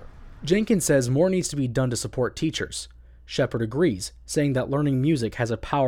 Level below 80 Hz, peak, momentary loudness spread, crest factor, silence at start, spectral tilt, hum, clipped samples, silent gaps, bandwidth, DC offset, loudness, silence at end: -46 dBFS; -8 dBFS; 10 LU; 16 dB; 0 s; -5.5 dB/octave; none; under 0.1%; none; 17.5 kHz; under 0.1%; -24 LUFS; 0 s